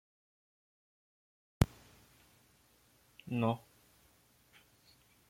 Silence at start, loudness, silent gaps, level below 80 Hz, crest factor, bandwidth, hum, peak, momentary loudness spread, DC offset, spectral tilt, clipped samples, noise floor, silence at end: 1.6 s; -36 LUFS; none; -54 dBFS; 34 dB; 16.5 kHz; 60 Hz at -60 dBFS; -10 dBFS; 24 LU; under 0.1%; -7 dB/octave; under 0.1%; -69 dBFS; 1.75 s